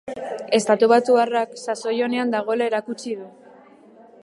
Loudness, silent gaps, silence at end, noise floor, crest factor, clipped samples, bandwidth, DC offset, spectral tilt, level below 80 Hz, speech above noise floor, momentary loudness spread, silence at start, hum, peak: -21 LUFS; none; 0.9 s; -48 dBFS; 18 dB; under 0.1%; 11.5 kHz; under 0.1%; -4 dB/octave; -74 dBFS; 28 dB; 15 LU; 0.05 s; none; -4 dBFS